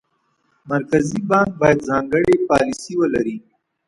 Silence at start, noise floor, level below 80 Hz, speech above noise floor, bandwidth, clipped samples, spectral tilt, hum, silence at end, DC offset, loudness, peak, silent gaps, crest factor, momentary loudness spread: 0.65 s; -66 dBFS; -48 dBFS; 49 dB; 11.5 kHz; under 0.1%; -6.5 dB/octave; none; 0.5 s; under 0.1%; -18 LUFS; 0 dBFS; none; 18 dB; 8 LU